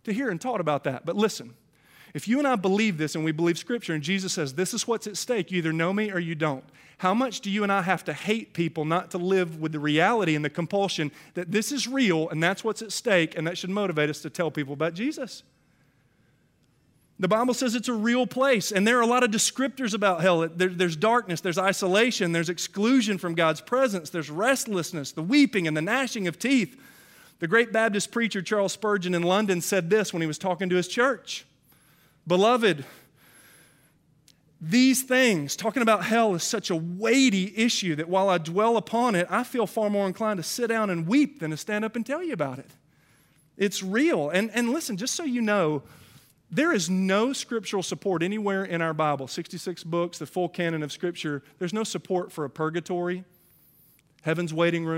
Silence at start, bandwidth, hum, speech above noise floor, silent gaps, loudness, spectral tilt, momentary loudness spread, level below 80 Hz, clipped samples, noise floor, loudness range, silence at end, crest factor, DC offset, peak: 0.05 s; 16 kHz; none; 40 dB; none; -25 LUFS; -4.5 dB/octave; 9 LU; -74 dBFS; under 0.1%; -65 dBFS; 6 LU; 0 s; 20 dB; under 0.1%; -6 dBFS